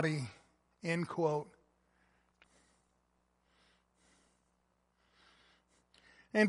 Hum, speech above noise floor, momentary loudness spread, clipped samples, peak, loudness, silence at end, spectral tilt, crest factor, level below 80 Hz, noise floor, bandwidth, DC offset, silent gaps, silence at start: none; 42 dB; 12 LU; under 0.1%; -16 dBFS; -38 LUFS; 0 s; -6.5 dB/octave; 24 dB; -78 dBFS; -78 dBFS; 11.5 kHz; under 0.1%; none; 0 s